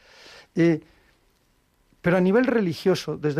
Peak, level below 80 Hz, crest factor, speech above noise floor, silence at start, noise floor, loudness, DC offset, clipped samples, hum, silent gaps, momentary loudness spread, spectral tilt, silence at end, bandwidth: -10 dBFS; -60 dBFS; 14 dB; 44 dB; 0.55 s; -65 dBFS; -23 LUFS; under 0.1%; under 0.1%; none; none; 9 LU; -7 dB/octave; 0 s; 14.5 kHz